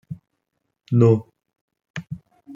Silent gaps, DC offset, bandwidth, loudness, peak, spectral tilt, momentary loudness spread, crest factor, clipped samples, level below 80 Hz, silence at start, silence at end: 1.61-1.68 s, 1.90-1.94 s; under 0.1%; 7.4 kHz; -19 LUFS; -4 dBFS; -9.5 dB/octave; 23 LU; 20 dB; under 0.1%; -62 dBFS; 0.1 s; 0 s